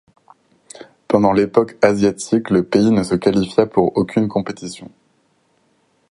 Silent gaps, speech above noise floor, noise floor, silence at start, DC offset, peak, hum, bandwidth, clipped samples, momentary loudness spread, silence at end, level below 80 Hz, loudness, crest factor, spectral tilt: none; 45 dB; -61 dBFS; 0.8 s; under 0.1%; 0 dBFS; none; 11.5 kHz; under 0.1%; 9 LU; 1.25 s; -50 dBFS; -17 LUFS; 18 dB; -6.5 dB/octave